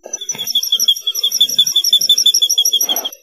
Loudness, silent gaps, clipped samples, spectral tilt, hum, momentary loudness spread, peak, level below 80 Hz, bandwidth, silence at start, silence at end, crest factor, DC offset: -11 LUFS; none; under 0.1%; 2.5 dB/octave; none; 7 LU; 0 dBFS; -74 dBFS; 15.5 kHz; 0.05 s; 0.1 s; 14 dB; under 0.1%